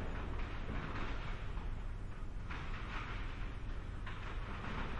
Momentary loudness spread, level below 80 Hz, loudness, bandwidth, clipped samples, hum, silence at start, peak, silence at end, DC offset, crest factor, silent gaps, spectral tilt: 4 LU; -44 dBFS; -45 LUFS; 8.2 kHz; under 0.1%; none; 0 s; -28 dBFS; 0 s; under 0.1%; 14 dB; none; -6.5 dB/octave